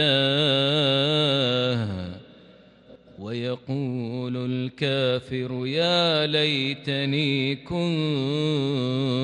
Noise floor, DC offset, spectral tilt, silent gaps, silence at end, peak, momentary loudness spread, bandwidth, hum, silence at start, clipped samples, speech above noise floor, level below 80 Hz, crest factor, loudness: -51 dBFS; under 0.1%; -6 dB/octave; none; 0 s; -8 dBFS; 10 LU; 10 kHz; none; 0 s; under 0.1%; 28 dB; -60 dBFS; 16 dB; -24 LUFS